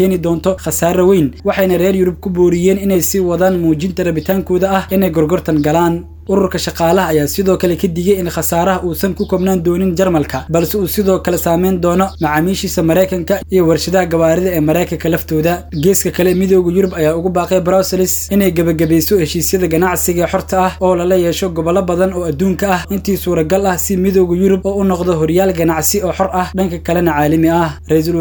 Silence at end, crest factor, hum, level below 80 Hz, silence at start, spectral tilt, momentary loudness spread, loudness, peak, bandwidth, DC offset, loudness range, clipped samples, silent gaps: 0 s; 12 dB; none; -32 dBFS; 0 s; -5.5 dB/octave; 4 LU; -13 LUFS; 0 dBFS; over 20 kHz; under 0.1%; 1 LU; under 0.1%; none